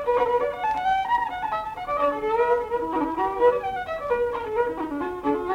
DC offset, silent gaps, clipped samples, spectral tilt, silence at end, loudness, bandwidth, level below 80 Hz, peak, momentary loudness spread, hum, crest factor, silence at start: under 0.1%; none; under 0.1%; -6 dB/octave; 0 s; -25 LUFS; 10 kHz; -50 dBFS; -8 dBFS; 7 LU; none; 16 dB; 0 s